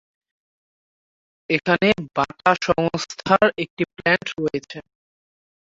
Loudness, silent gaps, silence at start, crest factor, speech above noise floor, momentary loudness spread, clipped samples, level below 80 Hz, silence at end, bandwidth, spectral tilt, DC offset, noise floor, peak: -21 LUFS; 3.70-3.77 s; 1.5 s; 22 dB; over 69 dB; 10 LU; under 0.1%; -54 dBFS; 0.8 s; 7.8 kHz; -5 dB/octave; under 0.1%; under -90 dBFS; -2 dBFS